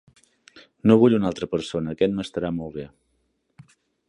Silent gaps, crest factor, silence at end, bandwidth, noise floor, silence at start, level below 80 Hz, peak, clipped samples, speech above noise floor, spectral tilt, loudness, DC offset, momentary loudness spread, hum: none; 20 dB; 1.2 s; 10.5 kHz; -71 dBFS; 0.55 s; -54 dBFS; -4 dBFS; under 0.1%; 49 dB; -7.5 dB/octave; -22 LUFS; under 0.1%; 17 LU; none